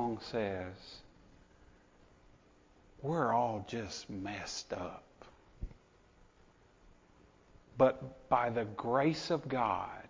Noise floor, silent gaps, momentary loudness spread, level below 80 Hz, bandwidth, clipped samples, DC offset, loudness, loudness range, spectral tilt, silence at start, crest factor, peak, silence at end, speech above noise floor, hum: -65 dBFS; none; 20 LU; -60 dBFS; 7.6 kHz; under 0.1%; under 0.1%; -35 LUFS; 12 LU; -5.5 dB/octave; 0 s; 24 dB; -14 dBFS; 0 s; 30 dB; none